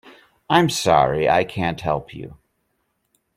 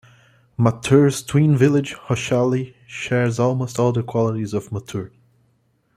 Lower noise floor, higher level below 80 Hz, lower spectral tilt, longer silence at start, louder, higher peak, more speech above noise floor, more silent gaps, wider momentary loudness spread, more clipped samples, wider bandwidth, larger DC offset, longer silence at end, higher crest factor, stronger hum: first, -71 dBFS vs -63 dBFS; about the same, -50 dBFS vs -54 dBFS; second, -5 dB/octave vs -6.5 dB/octave; about the same, 0.5 s vs 0.6 s; about the same, -19 LUFS vs -20 LUFS; about the same, -2 dBFS vs -2 dBFS; first, 52 dB vs 45 dB; neither; first, 20 LU vs 15 LU; neither; first, 16.5 kHz vs 14.5 kHz; neither; first, 1.05 s vs 0.9 s; about the same, 20 dB vs 18 dB; neither